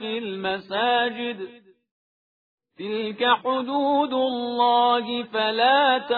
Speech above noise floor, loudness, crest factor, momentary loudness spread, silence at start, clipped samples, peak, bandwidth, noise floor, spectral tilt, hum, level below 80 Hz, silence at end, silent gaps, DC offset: over 67 dB; -22 LUFS; 18 dB; 12 LU; 0 s; under 0.1%; -6 dBFS; 4.9 kHz; under -90 dBFS; -6.5 dB/octave; none; -70 dBFS; 0 s; 1.91-2.58 s; under 0.1%